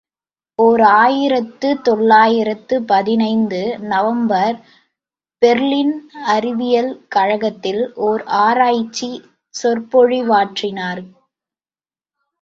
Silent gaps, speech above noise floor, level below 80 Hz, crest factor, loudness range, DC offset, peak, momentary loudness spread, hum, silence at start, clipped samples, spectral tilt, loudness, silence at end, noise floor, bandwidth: none; over 75 dB; -62 dBFS; 16 dB; 4 LU; under 0.1%; 0 dBFS; 12 LU; none; 0.6 s; under 0.1%; -5 dB/octave; -15 LUFS; 1.35 s; under -90 dBFS; 7.6 kHz